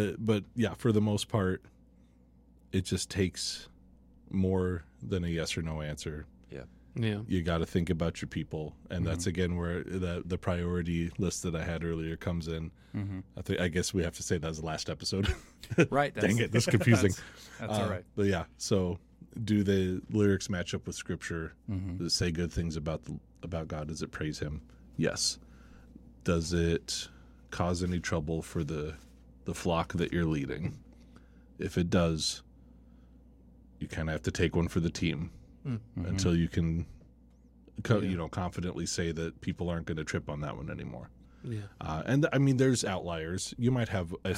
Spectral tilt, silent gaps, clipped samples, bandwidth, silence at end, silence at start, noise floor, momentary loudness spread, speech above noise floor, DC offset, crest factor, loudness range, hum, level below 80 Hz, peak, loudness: -5.5 dB/octave; none; under 0.1%; 15.5 kHz; 0 s; 0 s; -60 dBFS; 13 LU; 29 dB; under 0.1%; 22 dB; 6 LU; none; -48 dBFS; -10 dBFS; -32 LUFS